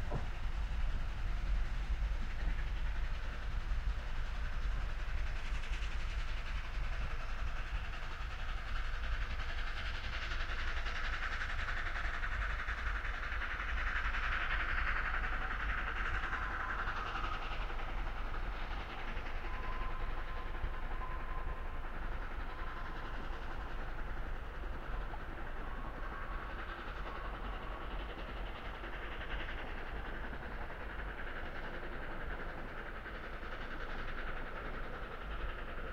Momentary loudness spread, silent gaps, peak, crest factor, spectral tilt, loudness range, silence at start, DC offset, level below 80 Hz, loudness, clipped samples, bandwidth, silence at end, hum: 7 LU; none; -22 dBFS; 16 dB; -5 dB/octave; 7 LU; 0 s; under 0.1%; -40 dBFS; -42 LUFS; under 0.1%; 7.6 kHz; 0 s; none